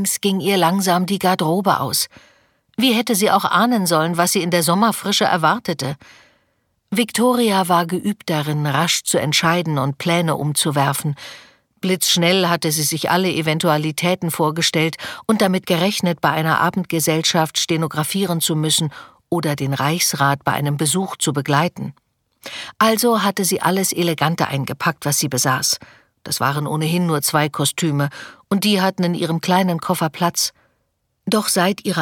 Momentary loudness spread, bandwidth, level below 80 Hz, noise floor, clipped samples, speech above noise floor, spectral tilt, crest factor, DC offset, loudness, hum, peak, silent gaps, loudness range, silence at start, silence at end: 7 LU; 19 kHz; -62 dBFS; -69 dBFS; under 0.1%; 51 dB; -4 dB/octave; 16 dB; under 0.1%; -18 LUFS; none; -2 dBFS; none; 2 LU; 0 s; 0 s